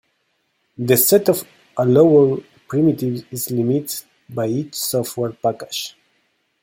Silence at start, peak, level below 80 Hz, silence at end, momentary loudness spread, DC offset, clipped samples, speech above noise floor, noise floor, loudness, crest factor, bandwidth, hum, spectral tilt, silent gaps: 0.8 s; -2 dBFS; -62 dBFS; 0.7 s; 15 LU; under 0.1%; under 0.1%; 50 dB; -68 dBFS; -18 LUFS; 18 dB; 17 kHz; none; -5.5 dB/octave; none